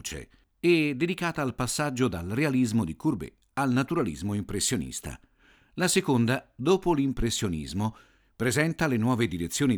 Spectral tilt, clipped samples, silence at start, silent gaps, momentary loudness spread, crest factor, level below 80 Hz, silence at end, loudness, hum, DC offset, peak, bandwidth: -5 dB/octave; under 0.1%; 0.05 s; none; 10 LU; 18 dB; -48 dBFS; 0 s; -27 LUFS; none; under 0.1%; -8 dBFS; over 20 kHz